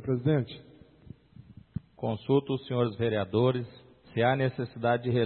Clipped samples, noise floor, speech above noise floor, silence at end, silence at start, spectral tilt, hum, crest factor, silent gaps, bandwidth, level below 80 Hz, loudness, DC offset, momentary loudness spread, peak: under 0.1%; -52 dBFS; 24 dB; 0 s; 0 s; -11 dB/octave; none; 18 dB; none; 4.4 kHz; -62 dBFS; -29 LUFS; under 0.1%; 16 LU; -12 dBFS